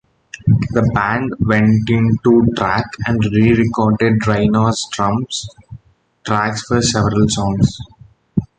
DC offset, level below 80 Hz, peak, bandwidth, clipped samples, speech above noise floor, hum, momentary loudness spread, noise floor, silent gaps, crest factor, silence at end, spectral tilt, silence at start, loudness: under 0.1%; -36 dBFS; 0 dBFS; 9.4 kHz; under 0.1%; 31 dB; none; 9 LU; -45 dBFS; none; 16 dB; 0.15 s; -6 dB/octave; 0.35 s; -15 LUFS